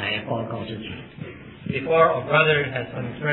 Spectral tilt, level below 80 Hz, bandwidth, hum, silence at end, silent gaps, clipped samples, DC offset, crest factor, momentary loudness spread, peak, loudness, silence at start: -9 dB/octave; -54 dBFS; 4.2 kHz; none; 0 s; none; under 0.1%; under 0.1%; 20 dB; 19 LU; -4 dBFS; -22 LUFS; 0 s